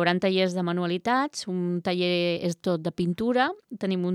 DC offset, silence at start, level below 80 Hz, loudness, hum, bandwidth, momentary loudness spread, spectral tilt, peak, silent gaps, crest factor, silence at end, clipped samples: under 0.1%; 0 s; -64 dBFS; -26 LUFS; none; 12.5 kHz; 5 LU; -6 dB/octave; -6 dBFS; none; 18 dB; 0 s; under 0.1%